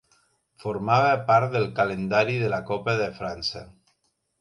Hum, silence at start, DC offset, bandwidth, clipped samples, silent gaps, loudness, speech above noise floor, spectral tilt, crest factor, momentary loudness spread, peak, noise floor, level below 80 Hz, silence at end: none; 0.65 s; under 0.1%; 11.5 kHz; under 0.1%; none; -24 LUFS; 48 dB; -6 dB/octave; 18 dB; 10 LU; -6 dBFS; -72 dBFS; -56 dBFS; 0.75 s